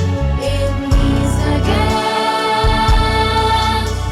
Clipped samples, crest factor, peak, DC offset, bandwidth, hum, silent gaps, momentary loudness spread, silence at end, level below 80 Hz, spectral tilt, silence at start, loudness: under 0.1%; 10 dB; -4 dBFS; under 0.1%; 14.5 kHz; none; none; 4 LU; 0 s; -20 dBFS; -5.5 dB/octave; 0 s; -15 LUFS